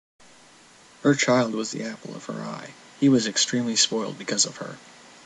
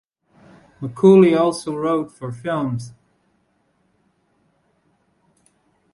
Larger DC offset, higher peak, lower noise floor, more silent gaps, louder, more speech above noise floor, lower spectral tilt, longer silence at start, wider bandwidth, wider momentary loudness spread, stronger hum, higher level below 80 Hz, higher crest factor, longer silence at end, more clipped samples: neither; about the same, -4 dBFS vs -2 dBFS; second, -52 dBFS vs -65 dBFS; neither; second, -23 LUFS vs -18 LUFS; second, 28 dB vs 48 dB; second, -3 dB/octave vs -7.5 dB/octave; first, 1.05 s vs 0.8 s; about the same, 11 kHz vs 11.5 kHz; second, 17 LU vs 20 LU; neither; second, -70 dBFS vs -62 dBFS; about the same, 20 dB vs 20 dB; second, 0.45 s vs 3.05 s; neither